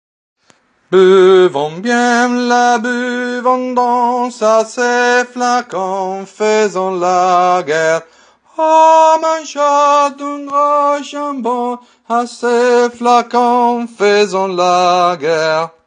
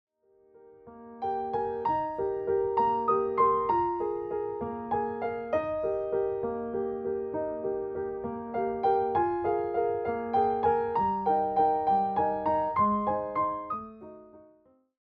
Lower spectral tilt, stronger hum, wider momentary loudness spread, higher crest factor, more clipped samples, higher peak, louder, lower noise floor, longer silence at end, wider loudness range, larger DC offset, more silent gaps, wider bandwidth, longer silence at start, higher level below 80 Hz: second, -4 dB/octave vs -9.5 dB/octave; neither; about the same, 9 LU vs 9 LU; about the same, 12 dB vs 16 dB; neither; first, 0 dBFS vs -14 dBFS; first, -12 LUFS vs -29 LUFS; second, -53 dBFS vs -63 dBFS; second, 0.2 s vs 0.6 s; about the same, 3 LU vs 5 LU; neither; neither; first, 10 kHz vs 5 kHz; first, 0.9 s vs 0.65 s; second, -72 dBFS vs -60 dBFS